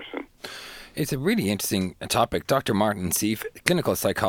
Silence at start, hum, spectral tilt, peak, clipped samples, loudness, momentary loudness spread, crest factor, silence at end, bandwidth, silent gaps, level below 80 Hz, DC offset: 0 s; none; -4 dB/octave; 0 dBFS; under 0.1%; -24 LUFS; 14 LU; 26 dB; 0 s; 19.5 kHz; none; -52 dBFS; under 0.1%